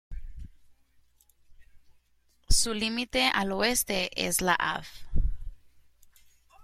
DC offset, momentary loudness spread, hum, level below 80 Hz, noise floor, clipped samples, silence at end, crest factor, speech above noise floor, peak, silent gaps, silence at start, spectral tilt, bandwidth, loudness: under 0.1%; 21 LU; none; -36 dBFS; -66 dBFS; under 0.1%; 1.05 s; 22 dB; 38 dB; -8 dBFS; none; 0.1 s; -2.5 dB/octave; 16 kHz; -27 LUFS